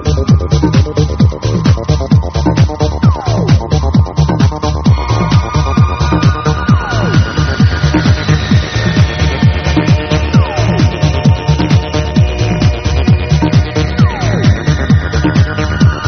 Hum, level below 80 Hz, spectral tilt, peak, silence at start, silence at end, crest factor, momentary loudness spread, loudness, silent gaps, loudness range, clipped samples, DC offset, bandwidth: none; -18 dBFS; -6.5 dB/octave; 0 dBFS; 0 s; 0 s; 10 dB; 2 LU; -11 LUFS; none; 0 LU; under 0.1%; under 0.1%; 6.6 kHz